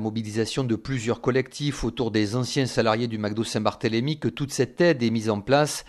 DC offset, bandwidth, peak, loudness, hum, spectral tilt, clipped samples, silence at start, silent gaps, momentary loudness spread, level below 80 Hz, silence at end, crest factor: under 0.1%; 13 kHz; -6 dBFS; -25 LUFS; none; -5.5 dB/octave; under 0.1%; 0 s; none; 6 LU; -48 dBFS; 0.05 s; 20 dB